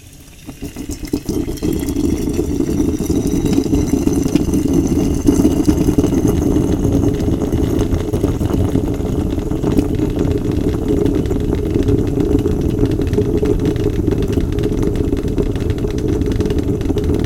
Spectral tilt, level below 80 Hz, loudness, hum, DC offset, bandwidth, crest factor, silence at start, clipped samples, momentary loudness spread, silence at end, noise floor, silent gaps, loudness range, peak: -7.5 dB/octave; -24 dBFS; -17 LUFS; none; under 0.1%; 17 kHz; 16 dB; 0.05 s; under 0.1%; 5 LU; 0 s; -36 dBFS; none; 3 LU; 0 dBFS